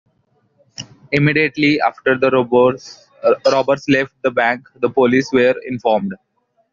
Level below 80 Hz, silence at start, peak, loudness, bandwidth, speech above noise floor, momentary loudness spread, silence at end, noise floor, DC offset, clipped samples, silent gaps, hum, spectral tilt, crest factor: -56 dBFS; 0.8 s; -2 dBFS; -16 LUFS; 7.4 kHz; 46 dB; 10 LU; 0.6 s; -62 dBFS; under 0.1%; under 0.1%; none; none; -4.5 dB/octave; 16 dB